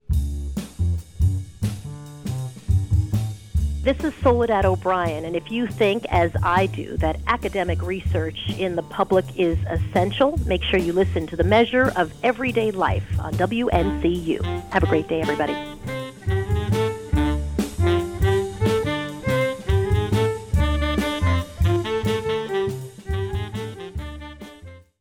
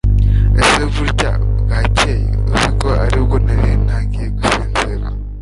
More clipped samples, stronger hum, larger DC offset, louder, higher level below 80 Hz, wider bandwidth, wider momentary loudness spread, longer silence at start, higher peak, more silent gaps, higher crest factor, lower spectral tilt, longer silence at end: neither; second, none vs 50 Hz at -15 dBFS; neither; second, -23 LUFS vs -15 LUFS; second, -32 dBFS vs -16 dBFS; first, 16 kHz vs 11.5 kHz; first, 10 LU vs 6 LU; about the same, 0.1 s vs 0.05 s; second, -6 dBFS vs 0 dBFS; neither; about the same, 16 dB vs 14 dB; first, -6.5 dB/octave vs -5 dB/octave; first, 0.2 s vs 0 s